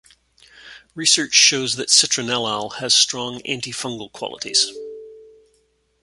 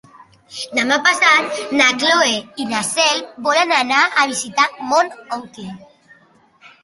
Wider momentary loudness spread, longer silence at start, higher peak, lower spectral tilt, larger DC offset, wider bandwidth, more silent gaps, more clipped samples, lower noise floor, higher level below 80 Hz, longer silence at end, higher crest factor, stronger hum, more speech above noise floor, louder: about the same, 17 LU vs 16 LU; first, 0.6 s vs 0.2 s; about the same, 0 dBFS vs -2 dBFS; about the same, -0.5 dB/octave vs -1 dB/octave; neither; about the same, 11.5 kHz vs 11.5 kHz; neither; neither; first, -64 dBFS vs -53 dBFS; about the same, -64 dBFS vs -66 dBFS; second, 0.8 s vs 1 s; first, 22 dB vs 16 dB; neither; first, 44 dB vs 35 dB; about the same, -17 LUFS vs -15 LUFS